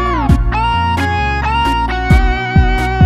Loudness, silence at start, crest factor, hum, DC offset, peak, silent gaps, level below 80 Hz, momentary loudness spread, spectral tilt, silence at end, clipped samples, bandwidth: -14 LUFS; 0 s; 12 dB; none; under 0.1%; 0 dBFS; none; -16 dBFS; 2 LU; -6.5 dB/octave; 0 s; under 0.1%; 13 kHz